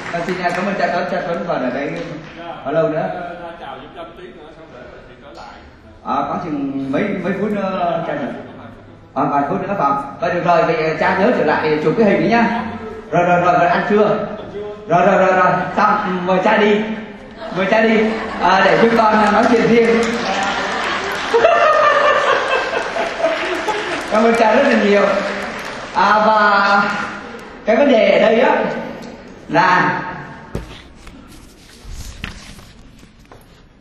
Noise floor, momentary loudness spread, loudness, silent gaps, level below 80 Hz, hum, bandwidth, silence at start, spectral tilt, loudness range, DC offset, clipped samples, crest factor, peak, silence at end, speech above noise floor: -43 dBFS; 19 LU; -15 LUFS; none; -46 dBFS; none; 12.5 kHz; 0 s; -5.5 dB/octave; 11 LU; under 0.1%; under 0.1%; 16 dB; 0 dBFS; 0.45 s; 28 dB